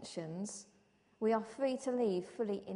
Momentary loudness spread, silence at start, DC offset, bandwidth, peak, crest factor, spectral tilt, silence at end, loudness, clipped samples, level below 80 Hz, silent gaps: 9 LU; 0 s; under 0.1%; 10.5 kHz; -22 dBFS; 16 dB; -5.5 dB/octave; 0 s; -37 LUFS; under 0.1%; -80 dBFS; none